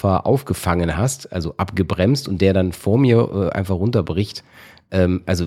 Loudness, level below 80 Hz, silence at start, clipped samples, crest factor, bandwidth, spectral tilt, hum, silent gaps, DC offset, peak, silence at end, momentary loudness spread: -19 LUFS; -40 dBFS; 0.05 s; under 0.1%; 18 dB; 15.5 kHz; -6.5 dB/octave; none; none; under 0.1%; -2 dBFS; 0 s; 8 LU